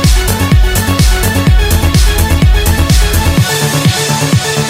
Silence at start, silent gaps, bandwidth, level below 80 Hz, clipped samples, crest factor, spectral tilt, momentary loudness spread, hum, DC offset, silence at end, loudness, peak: 0 s; none; 16.5 kHz; -12 dBFS; under 0.1%; 8 dB; -4.5 dB/octave; 1 LU; none; under 0.1%; 0 s; -10 LUFS; 0 dBFS